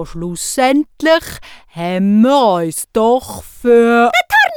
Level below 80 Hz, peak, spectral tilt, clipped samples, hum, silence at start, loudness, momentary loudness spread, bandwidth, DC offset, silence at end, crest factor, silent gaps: -42 dBFS; -2 dBFS; -4.5 dB/octave; under 0.1%; none; 0 s; -13 LUFS; 14 LU; 19.5 kHz; under 0.1%; 0 s; 12 dB; none